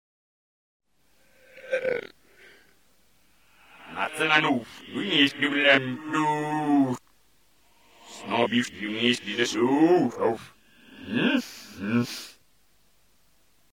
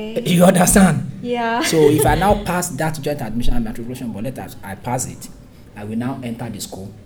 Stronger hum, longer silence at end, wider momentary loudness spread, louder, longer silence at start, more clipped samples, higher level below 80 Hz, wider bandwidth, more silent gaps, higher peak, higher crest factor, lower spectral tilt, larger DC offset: neither; first, 1.45 s vs 0.05 s; about the same, 16 LU vs 17 LU; second, -25 LUFS vs -18 LUFS; first, 1.55 s vs 0 s; neither; second, -72 dBFS vs -30 dBFS; second, 17 kHz vs over 20 kHz; neither; second, -4 dBFS vs 0 dBFS; first, 24 dB vs 16 dB; about the same, -4.5 dB/octave vs -5 dB/octave; neither